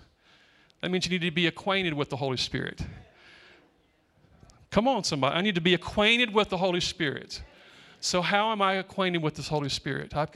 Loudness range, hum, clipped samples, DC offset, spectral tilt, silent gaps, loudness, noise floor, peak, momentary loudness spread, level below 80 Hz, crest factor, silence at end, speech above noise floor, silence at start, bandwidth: 6 LU; none; under 0.1%; under 0.1%; -4 dB/octave; none; -27 LUFS; -66 dBFS; -8 dBFS; 10 LU; -54 dBFS; 22 dB; 0.1 s; 39 dB; 0.85 s; 13 kHz